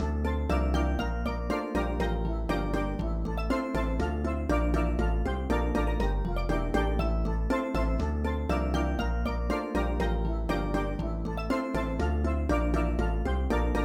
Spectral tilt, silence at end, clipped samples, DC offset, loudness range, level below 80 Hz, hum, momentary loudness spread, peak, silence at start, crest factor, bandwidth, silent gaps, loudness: -7.5 dB/octave; 0 s; under 0.1%; under 0.1%; 1 LU; -30 dBFS; none; 3 LU; -14 dBFS; 0 s; 14 dB; 11.5 kHz; none; -30 LUFS